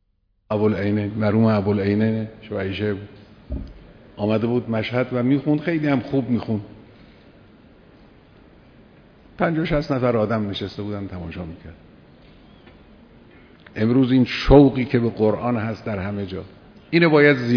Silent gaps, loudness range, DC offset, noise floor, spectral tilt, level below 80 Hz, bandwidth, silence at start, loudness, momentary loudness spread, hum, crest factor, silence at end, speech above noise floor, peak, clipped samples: none; 11 LU; under 0.1%; -66 dBFS; -8.5 dB/octave; -40 dBFS; 5.4 kHz; 0.5 s; -21 LUFS; 18 LU; none; 22 dB; 0 s; 46 dB; 0 dBFS; under 0.1%